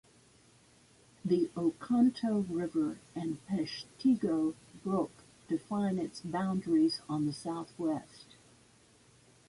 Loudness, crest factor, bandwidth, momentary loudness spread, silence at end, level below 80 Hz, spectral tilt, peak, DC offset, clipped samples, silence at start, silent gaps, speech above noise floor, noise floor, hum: -33 LUFS; 16 dB; 11.5 kHz; 11 LU; 1.25 s; -70 dBFS; -7 dB/octave; -16 dBFS; under 0.1%; under 0.1%; 1.25 s; none; 31 dB; -63 dBFS; none